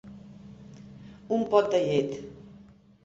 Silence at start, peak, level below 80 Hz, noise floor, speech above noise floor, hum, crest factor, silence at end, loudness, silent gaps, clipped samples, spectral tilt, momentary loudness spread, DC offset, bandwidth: 0.05 s; -8 dBFS; -62 dBFS; -54 dBFS; 28 dB; none; 22 dB; 0.55 s; -26 LUFS; none; under 0.1%; -6.5 dB/octave; 24 LU; under 0.1%; 7.8 kHz